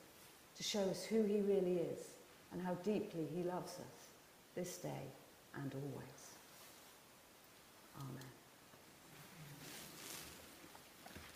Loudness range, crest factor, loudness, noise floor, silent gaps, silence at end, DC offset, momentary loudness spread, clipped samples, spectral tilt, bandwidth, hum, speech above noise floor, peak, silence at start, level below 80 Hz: 16 LU; 20 dB; -44 LUFS; -64 dBFS; none; 0 s; under 0.1%; 23 LU; under 0.1%; -5 dB/octave; 15.5 kHz; none; 22 dB; -26 dBFS; 0 s; -78 dBFS